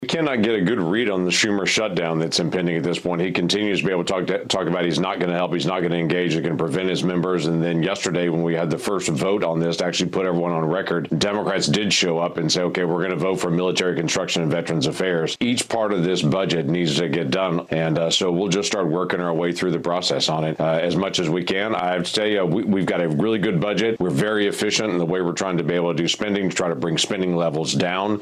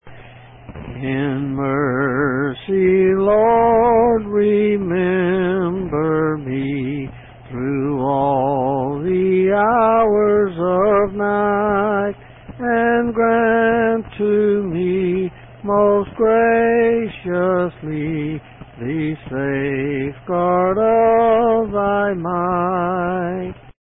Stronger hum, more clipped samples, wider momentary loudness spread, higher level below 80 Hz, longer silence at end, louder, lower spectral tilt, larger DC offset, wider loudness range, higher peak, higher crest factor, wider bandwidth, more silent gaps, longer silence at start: neither; neither; second, 3 LU vs 10 LU; second, -58 dBFS vs -44 dBFS; about the same, 0 s vs 0.1 s; second, -21 LUFS vs -17 LUFS; second, -4.5 dB/octave vs -12.5 dB/octave; neither; second, 1 LU vs 5 LU; about the same, -6 dBFS vs -4 dBFS; about the same, 16 dB vs 12 dB; first, 13.5 kHz vs 3.9 kHz; neither; about the same, 0 s vs 0.05 s